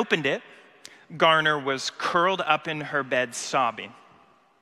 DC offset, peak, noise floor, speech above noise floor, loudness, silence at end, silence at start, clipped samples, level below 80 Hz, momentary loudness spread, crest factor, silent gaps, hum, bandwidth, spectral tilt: under 0.1%; -4 dBFS; -58 dBFS; 33 dB; -24 LUFS; 0.7 s; 0 s; under 0.1%; -74 dBFS; 11 LU; 22 dB; none; none; 14 kHz; -3 dB/octave